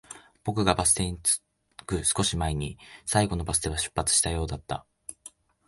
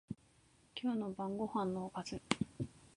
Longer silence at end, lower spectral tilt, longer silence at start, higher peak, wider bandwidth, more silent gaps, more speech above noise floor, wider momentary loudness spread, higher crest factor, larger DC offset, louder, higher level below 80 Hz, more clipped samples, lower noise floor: first, 0.4 s vs 0.1 s; second, -3 dB/octave vs -5.5 dB/octave; about the same, 0.1 s vs 0.1 s; first, -4 dBFS vs -12 dBFS; about the same, 12 kHz vs 11 kHz; neither; second, 25 dB vs 30 dB; first, 16 LU vs 11 LU; second, 24 dB vs 30 dB; neither; first, -26 LUFS vs -41 LUFS; first, -42 dBFS vs -66 dBFS; neither; second, -52 dBFS vs -69 dBFS